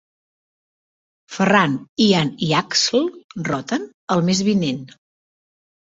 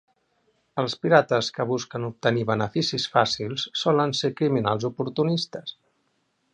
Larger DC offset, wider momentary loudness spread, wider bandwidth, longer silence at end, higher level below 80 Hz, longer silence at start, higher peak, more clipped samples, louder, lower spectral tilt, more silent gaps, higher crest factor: neither; about the same, 10 LU vs 9 LU; second, 8 kHz vs 10 kHz; first, 1.1 s vs 0.8 s; first, -58 dBFS vs -64 dBFS; first, 1.3 s vs 0.75 s; about the same, -2 dBFS vs -2 dBFS; neither; first, -19 LUFS vs -24 LUFS; about the same, -4.5 dB/octave vs -5 dB/octave; first, 1.89-1.96 s, 3.24-3.29 s, 3.94-4.08 s vs none; about the same, 20 dB vs 24 dB